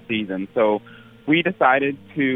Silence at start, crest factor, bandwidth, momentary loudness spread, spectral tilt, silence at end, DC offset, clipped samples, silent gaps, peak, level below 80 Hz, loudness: 0.1 s; 18 dB; 3.9 kHz; 9 LU; -8 dB/octave; 0 s; under 0.1%; under 0.1%; none; -4 dBFS; -62 dBFS; -20 LUFS